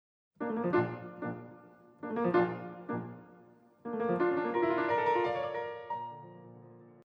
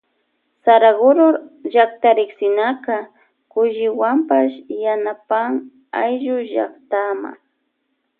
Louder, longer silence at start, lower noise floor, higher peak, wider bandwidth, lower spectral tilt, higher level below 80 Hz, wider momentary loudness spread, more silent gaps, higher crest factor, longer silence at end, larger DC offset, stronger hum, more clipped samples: second, -33 LUFS vs -17 LUFS; second, 0.4 s vs 0.65 s; second, -60 dBFS vs -71 dBFS; second, -16 dBFS vs 0 dBFS; first, 5.4 kHz vs 4.2 kHz; about the same, -8.5 dB/octave vs -8.5 dB/octave; about the same, -78 dBFS vs -76 dBFS; first, 20 LU vs 12 LU; neither; about the same, 18 dB vs 18 dB; second, 0.15 s vs 0.85 s; neither; neither; neither